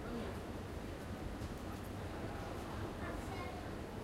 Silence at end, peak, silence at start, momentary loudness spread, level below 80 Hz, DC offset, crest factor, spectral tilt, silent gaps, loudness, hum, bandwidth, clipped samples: 0 s; -32 dBFS; 0 s; 2 LU; -52 dBFS; under 0.1%; 12 dB; -6 dB/octave; none; -45 LUFS; none; 16 kHz; under 0.1%